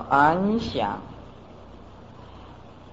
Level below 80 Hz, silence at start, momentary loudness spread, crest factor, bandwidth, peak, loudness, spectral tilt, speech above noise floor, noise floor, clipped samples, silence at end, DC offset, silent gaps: -50 dBFS; 0 s; 27 LU; 20 dB; 8 kHz; -6 dBFS; -23 LUFS; -7 dB/octave; 23 dB; -45 dBFS; under 0.1%; 0.05 s; 0.2%; none